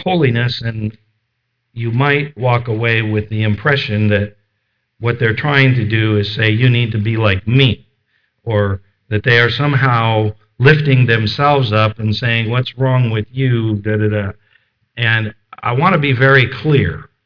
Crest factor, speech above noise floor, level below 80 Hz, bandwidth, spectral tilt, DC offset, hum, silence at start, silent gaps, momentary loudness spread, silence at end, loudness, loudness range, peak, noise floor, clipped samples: 14 dB; 56 dB; -46 dBFS; 5.4 kHz; -8 dB/octave; under 0.1%; none; 0 s; none; 10 LU; 0.2 s; -14 LUFS; 4 LU; 0 dBFS; -70 dBFS; under 0.1%